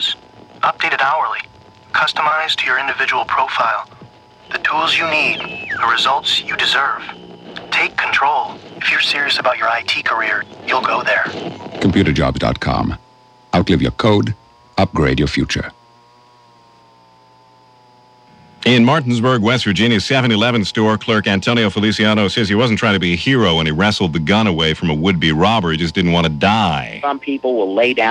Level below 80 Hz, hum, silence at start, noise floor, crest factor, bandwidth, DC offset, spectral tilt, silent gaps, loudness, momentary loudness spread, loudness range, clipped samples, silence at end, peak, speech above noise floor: -38 dBFS; none; 0 s; -48 dBFS; 16 dB; 12 kHz; under 0.1%; -5 dB/octave; none; -15 LUFS; 8 LU; 4 LU; under 0.1%; 0 s; 0 dBFS; 33 dB